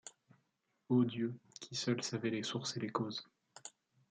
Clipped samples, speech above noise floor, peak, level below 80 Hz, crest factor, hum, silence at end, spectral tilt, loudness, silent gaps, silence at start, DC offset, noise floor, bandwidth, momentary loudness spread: under 0.1%; 45 dB; -20 dBFS; -84 dBFS; 20 dB; none; 0.4 s; -5 dB/octave; -38 LUFS; none; 0.05 s; under 0.1%; -82 dBFS; 9.4 kHz; 20 LU